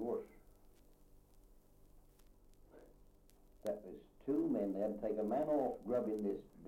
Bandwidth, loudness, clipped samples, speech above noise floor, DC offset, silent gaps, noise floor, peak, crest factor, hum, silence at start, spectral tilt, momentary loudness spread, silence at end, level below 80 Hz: 16.5 kHz; -40 LUFS; under 0.1%; 27 dB; under 0.1%; none; -65 dBFS; -26 dBFS; 16 dB; none; 0 s; -8.5 dB/octave; 12 LU; 0 s; -66 dBFS